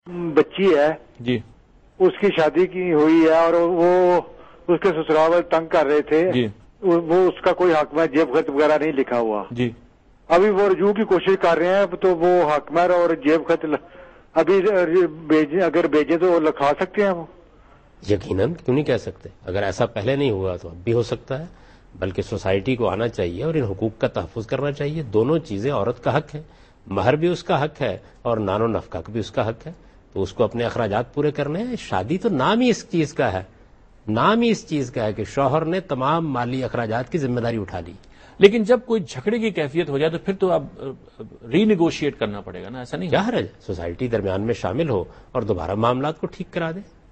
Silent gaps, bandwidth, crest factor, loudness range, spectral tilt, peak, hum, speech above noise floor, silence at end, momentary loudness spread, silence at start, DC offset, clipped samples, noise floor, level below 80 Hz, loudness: none; 8.4 kHz; 20 dB; 6 LU; -7 dB/octave; 0 dBFS; none; 30 dB; 0.3 s; 11 LU; 0.05 s; under 0.1%; under 0.1%; -50 dBFS; -50 dBFS; -21 LUFS